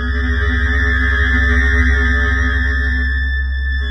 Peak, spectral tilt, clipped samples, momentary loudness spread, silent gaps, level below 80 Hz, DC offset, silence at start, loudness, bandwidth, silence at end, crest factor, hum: -2 dBFS; -6.5 dB/octave; under 0.1%; 5 LU; none; -16 dBFS; under 0.1%; 0 s; -15 LUFS; 6.2 kHz; 0 s; 12 dB; none